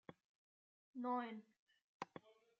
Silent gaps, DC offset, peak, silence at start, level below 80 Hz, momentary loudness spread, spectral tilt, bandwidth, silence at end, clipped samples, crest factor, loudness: 0.24-0.94 s, 1.59-1.67 s, 1.82-2.00 s; under 0.1%; -30 dBFS; 0.1 s; under -90 dBFS; 17 LU; -4 dB/octave; 7.4 kHz; 0.3 s; under 0.1%; 22 dB; -49 LUFS